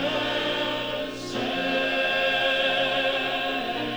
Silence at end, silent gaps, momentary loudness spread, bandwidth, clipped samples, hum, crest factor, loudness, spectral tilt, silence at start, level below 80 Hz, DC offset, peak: 0 s; none; 7 LU; over 20 kHz; under 0.1%; 60 Hz at -55 dBFS; 14 dB; -24 LUFS; -3.5 dB/octave; 0 s; -54 dBFS; under 0.1%; -12 dBFS